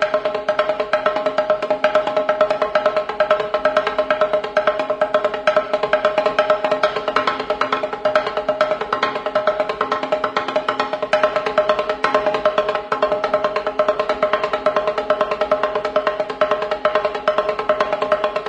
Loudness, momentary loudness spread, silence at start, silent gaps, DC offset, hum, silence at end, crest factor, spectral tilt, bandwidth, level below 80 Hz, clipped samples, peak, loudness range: -19 LUFS; 3 LU; 0 s; none; under 0.1%; none; 0 s; 18 dB; -4 dB/octave; 9 kHz; -52 dBFS; under 0.1%; -2 dBFS; 2 LU